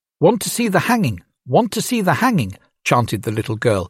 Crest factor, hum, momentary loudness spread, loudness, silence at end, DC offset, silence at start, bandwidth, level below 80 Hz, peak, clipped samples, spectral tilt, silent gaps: 16 dB; none; 7 LU; -18 LUFS; 0 s; under 0.1%; 0.2 s; 16.5 kHz; -52 dBFS; -2 dBFS; under 0.1%; -5 dB/octave; none